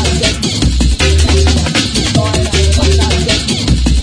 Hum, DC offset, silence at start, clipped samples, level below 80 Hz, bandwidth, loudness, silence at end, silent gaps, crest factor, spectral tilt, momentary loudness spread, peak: none; under 0.1%; 0 s; under 0.1%; -14 dBFS; 10.5 kHz; -11 LUFS; 0 s; none; 10 dB; -4.5 dB/octave; 3 LU; 0 dBFS